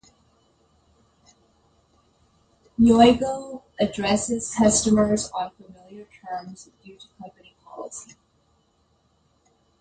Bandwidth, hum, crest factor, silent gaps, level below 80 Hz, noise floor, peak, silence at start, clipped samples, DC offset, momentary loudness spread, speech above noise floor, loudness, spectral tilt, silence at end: 9.4 kHz; none; 22 dB; none; -50 dBFS; -65 dBFS; -2 dBFS; 2.8 s; under 0.1%; under 0.1%; 28 LU; 43 dB; -21 LUFS; -4.5 dB/octave; 1.8 s